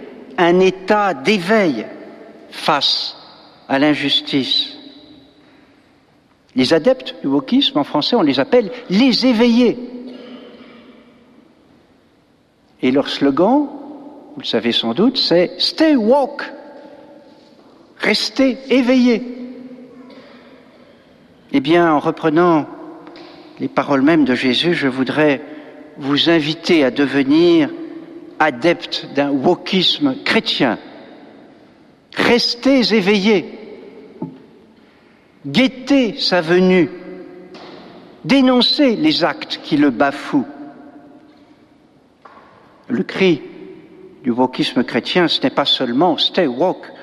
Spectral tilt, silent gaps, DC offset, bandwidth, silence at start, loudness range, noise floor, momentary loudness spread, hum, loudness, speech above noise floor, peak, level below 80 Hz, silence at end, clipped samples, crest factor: -5.5 dB/octave; none; under 0.1%; 12.5 kHz; 0 s; 5 LU; -55 dBFS; 20 LU; none; -15 LUFS; 40 dB; -2 dBFS; -56 dBFS; 0 s; under 0.1%; 16 dB